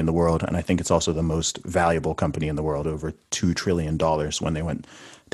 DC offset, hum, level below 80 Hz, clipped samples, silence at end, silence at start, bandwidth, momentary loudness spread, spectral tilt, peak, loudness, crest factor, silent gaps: under 0.1%; none; -40 dBFS; under 0.1%; 0.2 s; 0 s; 12.5 kHz; 7 LU; -5 dB/octave; -6 dBFS; -24 LUFS; 18 dB; none